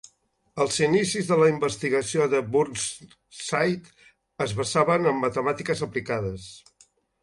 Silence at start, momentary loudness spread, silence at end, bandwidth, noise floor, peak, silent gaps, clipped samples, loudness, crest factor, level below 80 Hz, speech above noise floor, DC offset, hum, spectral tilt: 0.55 s; 13 LU; 0.65 s; 11.5 kHz; -65 dBFS; -6 dBFS; none; under 0.1%; -24 LUFS; 20 dB; -58 dBFS; 40 dB; under 0.1%; none; -4.5 dB/octave